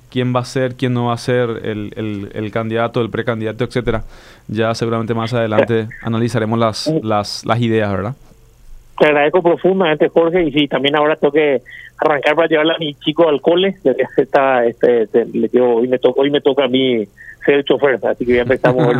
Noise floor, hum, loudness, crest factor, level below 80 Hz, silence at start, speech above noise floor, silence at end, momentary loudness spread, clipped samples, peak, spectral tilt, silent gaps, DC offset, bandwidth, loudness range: -39 dBFS; none; -16 LUFS; 14 dB; -42 dBFS; 0.1 s; 24 dB; 0 s; 8 LU; under 0.1%; 0 dBFS; -6.5 dB/octave; none; under 0.1%; 12.5 kHz; 5 LU